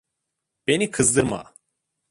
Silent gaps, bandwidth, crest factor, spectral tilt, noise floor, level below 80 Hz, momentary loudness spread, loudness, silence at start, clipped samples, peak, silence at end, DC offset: none; 11.5 kHz; 20 dB; -3.5 dB/octave; -81 dBFS; -52 dBFS; 12 LU; -21 LUFS; 0.7 s; under 0.1%; -4 dBFS; 0.7 s; under 0.1%